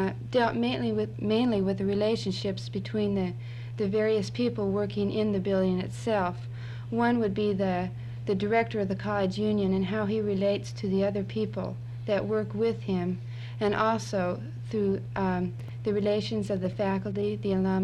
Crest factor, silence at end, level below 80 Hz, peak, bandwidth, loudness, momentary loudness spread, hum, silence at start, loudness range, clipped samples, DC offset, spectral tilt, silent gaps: 16 dB; 0 s; -54 dBFS; -12 dBFS; 10.5 kHz; -29 LUFS; 7 LU; none; 0 s; 2 LU; under 0.1%; under 0.1%; -7 dB/octave; none